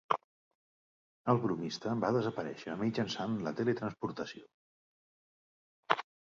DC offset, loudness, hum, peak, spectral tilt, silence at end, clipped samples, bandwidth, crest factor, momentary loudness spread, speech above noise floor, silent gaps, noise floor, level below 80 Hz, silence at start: under 0.1%; -35 LUFS; none; -6 dBFS; -5 dB/octave; 0.25 s; under 0.1%; 7.4 kHz; 30 dB; 9 LU; over 56 dB; 0.24-1.25 s, 4.54-5.83 s; under -90 dBFS; -72 dBFS; 0.1 s